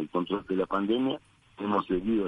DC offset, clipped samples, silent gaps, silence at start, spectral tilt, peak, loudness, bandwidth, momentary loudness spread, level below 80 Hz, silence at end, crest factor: under 0.1%; under 0.1%; none; 0 s; -8 dB/octave; -14 dBFS; -30 LUFS; 10 kHz; 6 LU; -56 dBFS; 0 s; 16 dB